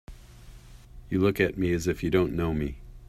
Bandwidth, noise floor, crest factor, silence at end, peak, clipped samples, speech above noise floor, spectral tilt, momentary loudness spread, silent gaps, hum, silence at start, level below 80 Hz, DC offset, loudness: 15 kHz; -48 dBFS; 18 dB; 0.05 s; -10 dBFS; under 0.1%; 22 dB; -6.5 dB/octave; 8 LU; none; none; 0.1 s; -44 dBFS; under 0.1%; -27 LUFS